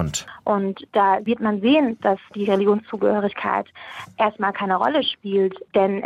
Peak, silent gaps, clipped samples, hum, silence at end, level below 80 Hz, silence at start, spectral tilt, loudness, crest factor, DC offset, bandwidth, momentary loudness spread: -6 dBFS; none; under 0.1%; none; 0 s; -54 dBFS; 0 s; -5 dB/octave; -21 LUFS; 14 dB; under 0.1%; 13.5 kHz; 7 LU